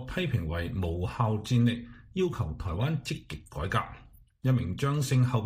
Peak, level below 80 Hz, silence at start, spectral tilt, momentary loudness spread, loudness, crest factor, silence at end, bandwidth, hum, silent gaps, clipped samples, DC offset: -12 dBFS; -46 dBFS; 0 s; -6.5 dB/octave; 11 LU; -30 LUFS; 16 dB; 0 s; 15.5 kHz; none; none; under 0.1%; under 0.1%